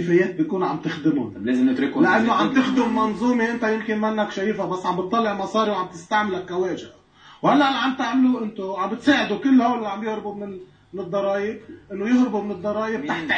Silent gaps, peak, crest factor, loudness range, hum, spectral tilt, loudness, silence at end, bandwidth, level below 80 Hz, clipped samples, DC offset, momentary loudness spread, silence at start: none; -4 dBFS; 18 dB; 4 LU; none; -6 dB/octave; -22 LUFS; 0 s; 8.4 kHz; -60 dBFS; under 0.1%; under 0.1%; 10 LU; 0 s